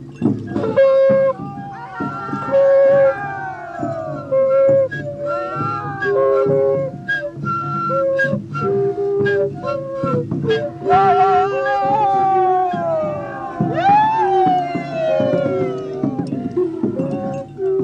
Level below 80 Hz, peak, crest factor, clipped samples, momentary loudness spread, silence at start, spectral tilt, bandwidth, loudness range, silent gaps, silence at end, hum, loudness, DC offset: -54 dBFS; -4 dBFS; 14 dB; under 0.1%; 11 LU; 0 s; -8 dB/octave; 7.4 kHz; 3 LU; none; 0 s; none; -18 LUFS; under 0.1%